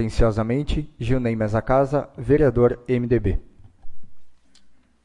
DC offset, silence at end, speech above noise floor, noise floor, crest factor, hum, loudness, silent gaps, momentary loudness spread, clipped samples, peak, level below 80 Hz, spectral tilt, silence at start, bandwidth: under 0.1%; 0.3 s; 32 dB; -52 dBFS; 16 dB; none; -22 LUFS; none; 8 LU; under 0.1%; -6 dBFS; -32 dBFS; -8.5 dB/octave; 0 s; 11 kHz